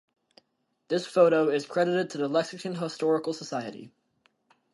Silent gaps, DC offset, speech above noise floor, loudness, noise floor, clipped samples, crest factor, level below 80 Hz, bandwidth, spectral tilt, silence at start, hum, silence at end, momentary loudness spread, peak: none; under 0.1%; 49 dB; -27 LUFS; -75 dBFS; under 0.1%; 20 dB; -80 dBFS; 11.5 kHz; -5.5 dB/octave; 0.9 s; none; 0.85 s; 13 LU; -8 dBFS